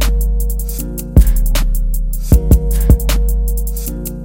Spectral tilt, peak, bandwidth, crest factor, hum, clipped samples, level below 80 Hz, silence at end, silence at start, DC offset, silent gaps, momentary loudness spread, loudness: -6 dB/octave; 0 dBFS; 17.5 kHz; 12 dB; none; 0.4%; -14 dBFS; 0 s; 0 s; under 0.1%; none; 9 LU; -16 LUFS